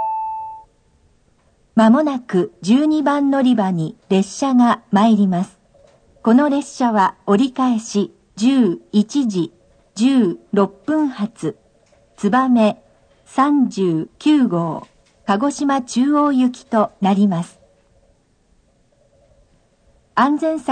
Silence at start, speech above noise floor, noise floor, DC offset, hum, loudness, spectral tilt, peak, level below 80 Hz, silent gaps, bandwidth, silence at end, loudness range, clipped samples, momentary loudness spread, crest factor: 0 s; 42 dB; -58 dBFS; under 0.1%; none; -17 LUFS; -6.5 dB/octave; -2 dBFS; -60 dBFS; none; 9.4 kHz; 0 s; 4 LU; under 0.1%; 10 LU; 16 dB